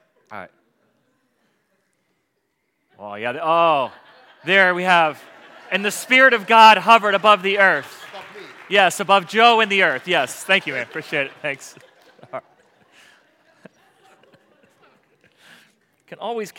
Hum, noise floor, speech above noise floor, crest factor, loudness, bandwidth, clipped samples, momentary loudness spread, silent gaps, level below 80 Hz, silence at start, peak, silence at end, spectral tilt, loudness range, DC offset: none; -72 dBFS; 54 dB; 20 dB; -16 LUFS; 17 kHz; under 0.1%; 24 LU; none; -78 dBFS; 0.3 s; 0 dBFS; 0.1 s; -3 dB/octave; 16 LU; under 0.1%